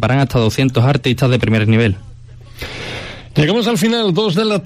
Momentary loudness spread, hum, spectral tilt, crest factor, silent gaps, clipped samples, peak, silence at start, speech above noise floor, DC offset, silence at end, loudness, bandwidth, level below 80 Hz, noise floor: 13 LU; none; -6 dB/octave; 12 dB; none; under 0.1%; -2 dBFS; 0 s; 22 dB; under 0.1%; 0 s; -15 LUFS; 15 kHz; -38 dBFS; -36 dBFS